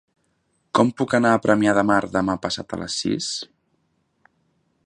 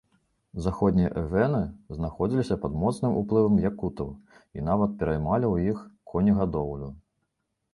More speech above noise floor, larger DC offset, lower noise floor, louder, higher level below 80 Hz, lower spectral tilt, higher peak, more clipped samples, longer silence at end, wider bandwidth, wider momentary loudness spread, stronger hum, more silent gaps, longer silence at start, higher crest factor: second, 48 dB vs 53 dB; neither; second, -69 dBFS vs -78 dBFS; first, -21 LUFS vs -27 LUFS; second, -54 dBFS vs -44 dBFS; second, -4.5 dB/octave vs -9 dB/octave; first, -2 dBFS vs -8 dBFS; neither; first, 1.4 s vs 0.75 s; about the same, 11 kHz vs 11.5 kHz; about the same, 10 LU vs 12 LU; neither; neither; first, 0.75 s vs 0.55 s; about the same, 22 dB vs 18 dB